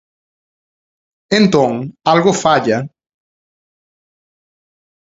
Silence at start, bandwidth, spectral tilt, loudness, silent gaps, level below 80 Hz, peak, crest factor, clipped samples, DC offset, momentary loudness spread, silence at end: 1.3 s; 7.8 kHz; -5 dB/octave; -14 LUFS; none; -54 dBFS; 0 dBFS; 18 dB; under 0.1%; under 0.1%; 7 LU; 2.2 s